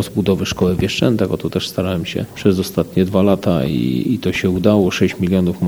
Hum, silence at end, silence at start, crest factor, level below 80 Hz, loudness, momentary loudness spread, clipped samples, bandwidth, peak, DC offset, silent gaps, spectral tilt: none; 0 s; 0 s; 16 dB; -42 dBFS; -17 LUFS; 6 LU; under 0.1%; over 20 kHz; 0 dBFS; 0.1%; none; -6.5 dB/octave